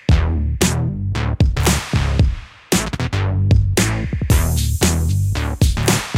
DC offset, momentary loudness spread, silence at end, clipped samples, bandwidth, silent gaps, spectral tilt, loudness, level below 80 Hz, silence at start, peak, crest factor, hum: under 0.1%; 6 LU; 0 s; under 0.1%; 16.5 kHz; none; -5 dB/octave; -18 LUFS; -22 dBFS; 0.1 s; -2 dBFS; 16 dB; none